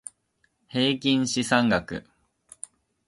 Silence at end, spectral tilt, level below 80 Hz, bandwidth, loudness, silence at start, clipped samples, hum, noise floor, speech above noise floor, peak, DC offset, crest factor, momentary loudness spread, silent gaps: 1.05 s; -4 dB/octave; -58 dBFS; 11.5 kHz; -24 LUFS; 0.75 s; under 0.1%; none; -71 dBFS; 47 dB; -6 dBFS; under 0.1%; 20 dB; 20 LU; none